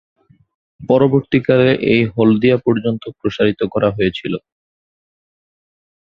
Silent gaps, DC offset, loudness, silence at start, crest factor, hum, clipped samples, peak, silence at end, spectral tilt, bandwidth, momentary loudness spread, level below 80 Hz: none; under 0.1%; -15 LUFS; 0.8 s; 16 dB; none; under 0.1%; -2 dBFS; 1.65 s; -8.5 dB/octave; 6.6 kHz; 11 LU; -48 dBFS